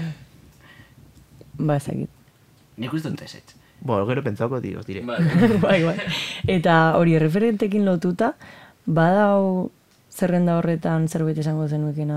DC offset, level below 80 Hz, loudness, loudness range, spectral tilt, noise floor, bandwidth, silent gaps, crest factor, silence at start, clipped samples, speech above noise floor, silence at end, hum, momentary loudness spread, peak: under 0.1%; -54 dBFS; -21 LUFS; 11 LU; -7 dB/octave; -55 dBFS; 14 kHz; none; 18 dB; 0 s; under 0.1%; 34 dB; 0 s; none; 16 LU; -4 dBFS